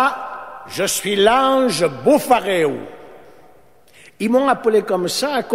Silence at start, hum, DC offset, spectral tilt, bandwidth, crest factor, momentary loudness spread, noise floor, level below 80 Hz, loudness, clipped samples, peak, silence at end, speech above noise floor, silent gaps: 0 s; none; 0.4%; -3.5 dB/octave; 16 kHz; 18 dB; 15 LU; -51 dBFS; -54 dBFS; -17 LUFS; under 0.1%; 0 dBFS; 0 s; 34 dB; none